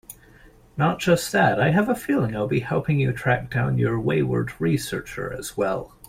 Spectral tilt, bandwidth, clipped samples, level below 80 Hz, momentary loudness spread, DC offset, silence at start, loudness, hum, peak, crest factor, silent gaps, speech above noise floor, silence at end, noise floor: -6 dB/octave; 16 kHz; under 0.1%; -48 dBFS; 10 LU; under 0.1%; 0.1 s; -23 LUFS; none; -6 dBFS; 18 dB; none; 28 dB; 0.2 s; -51 dBFS